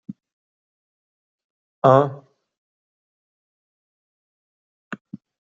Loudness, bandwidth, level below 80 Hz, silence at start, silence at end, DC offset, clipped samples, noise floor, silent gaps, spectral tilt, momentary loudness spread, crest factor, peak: -18 LUFS; 7.4 kHz; -68 dBFS; 0.1 s; 0.4 s; under 0.1%; under 0.1%; under -90 dBFS; 0.33-1.82 s, 2.57-4.91 s, 5.01-5.05 s; -7 dB/octave; 23 LU; 24 dB; -2 dBFS